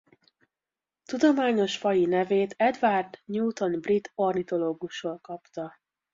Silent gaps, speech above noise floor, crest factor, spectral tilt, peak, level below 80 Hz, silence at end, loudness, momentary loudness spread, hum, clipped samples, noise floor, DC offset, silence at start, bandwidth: none; over 64 dB; 16 dB; -5.5 dB/octave; -10 dBFS; -70 dBFS; 0.45 s; -26 LUFS; 14 LU; none; under 0.1%; under -90 dBFS; under 0.1%; 1.1 s; 7.6 kHz